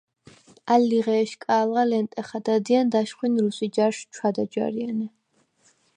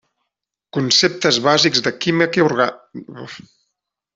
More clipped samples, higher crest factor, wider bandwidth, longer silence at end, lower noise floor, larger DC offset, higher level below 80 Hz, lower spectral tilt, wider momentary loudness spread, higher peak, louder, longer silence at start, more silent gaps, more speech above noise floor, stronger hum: neither; about the same, 18 dB vs 18 dB; first, 10 kHz vs 8 kHz; about the same, 0.9 s vs 0.8 s; second, -64 dBFS vs -80 dBFS; neither; second, -74 dBFS vs -60 dBFS; first, -5.5 dB/octave vs -3.5 dB/octave; second, 9 LU vs 21 LU; second, -6 dBFS vs -2 dBFS; second, -24 LUFS vs -16 LUFS; about the same, 0.65 s vs 0.75 s; neither; second, 41 dB vs 62 dB; neither